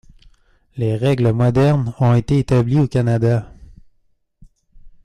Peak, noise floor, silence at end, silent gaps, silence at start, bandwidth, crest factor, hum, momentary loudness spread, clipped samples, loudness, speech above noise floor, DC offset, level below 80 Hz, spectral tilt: -6 dBFS; -61 dBFS; 0.15 s; none; 0.75 s; 10 kHz; 12 dB; none; 7 LU; under 0.1%; -17 LUFS; 45 dB; under 0.1%; -42 dBFS; -8.5 dB/octave